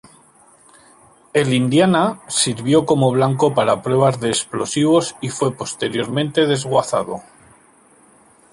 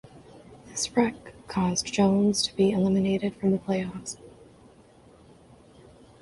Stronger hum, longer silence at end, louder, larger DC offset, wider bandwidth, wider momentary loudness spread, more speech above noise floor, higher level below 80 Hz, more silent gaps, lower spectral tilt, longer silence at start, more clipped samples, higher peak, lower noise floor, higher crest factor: neither; second, 1.3 s vs 1.95 s; first, -18 LUFS vs -26 LUFS; neither; about the same, 11.5 kHz vs 11.5 kHz; second, 7 LU vs 15 LU; first, 34 dB vs 29 dB; about the same, -56 dBFS vs -56 dBFS; neither; about the same, -5 dB/octave vs -5 dB/octave; first, 1.35 s vs 0.15 s; neither; first, -2 dBFS vs -10 dBFS; about the same, -51 dBFS vs -54 dBFS; about the same, 16 dB vs 18 dB